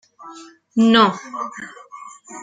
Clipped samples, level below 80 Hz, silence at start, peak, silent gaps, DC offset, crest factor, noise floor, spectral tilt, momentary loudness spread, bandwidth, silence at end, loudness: under 0.1%; -62 dBFS; 0.25 s; -2 dBFS; none; under 0.1%; 18 dB; -42 dBFS; -4.5 dB/octave; 25 LU; 9.2 kHz; 0 s; -17 LUFS